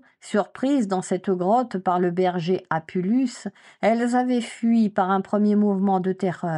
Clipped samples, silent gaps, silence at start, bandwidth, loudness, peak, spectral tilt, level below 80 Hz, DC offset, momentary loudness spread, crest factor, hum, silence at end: under 0.1%; none; 0.25 s; 11 kHz; -23 LUFS; -8 dBFS; -7 dB/octave; -72 dBFS; under 0.1%; 6 LU; 14 dB; none; 0 s